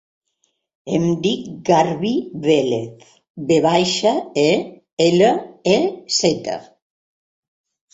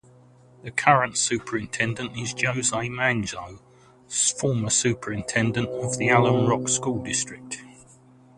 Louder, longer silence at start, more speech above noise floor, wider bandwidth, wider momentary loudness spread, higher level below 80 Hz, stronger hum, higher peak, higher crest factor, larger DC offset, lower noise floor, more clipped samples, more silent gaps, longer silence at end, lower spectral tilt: first, -18 LUFS vs -23 LUFS; first, 0.85 s vs 0.65 s; first, 51 dB vs 29 dB; second, 8.2 kHz vs 11.5 kHz; about the same, 10 LU vs 12 LU; about the same, -58 dBFS vs -56 dBFS; neither; about the same, -2 dBFS vs -2 dBFS; second, 18 dB vs 24 dB; neither; first, -69 dBFS vs -53 dBFS; neither; first, 3.30-3.34 s, 4.93-4.97 s vs none; first, 1.3 s vs 0.65 s; about the same, -4.5 dB/octave vs -3.5 dB/octave